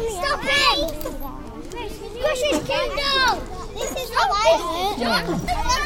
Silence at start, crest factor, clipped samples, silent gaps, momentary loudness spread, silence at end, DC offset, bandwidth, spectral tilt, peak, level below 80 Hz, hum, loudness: 0 s; 18 dB; under 0.1%; none; 15 LU; 0 s; under 0.1%; 17 kHz; -3 dB/octave; -4 dBFS; -34 dBFS; none; -21 LUFS